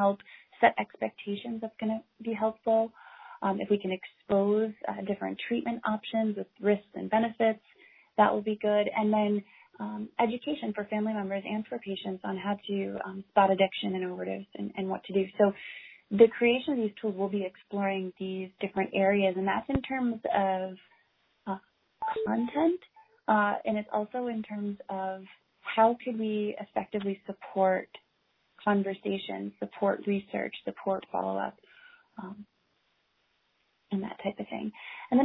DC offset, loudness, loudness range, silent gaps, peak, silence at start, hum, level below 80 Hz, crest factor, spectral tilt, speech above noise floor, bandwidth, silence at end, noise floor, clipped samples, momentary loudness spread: under 0.1%; -30 LUFS; 5 LU; none; -6 dBFS; 0 s; none; -64 dBFS; 24 dB; -9.5 dB/octave; 44 dB; 4.1 kHz; 0 s; -74 dBFS; under 0.1%; 13 LU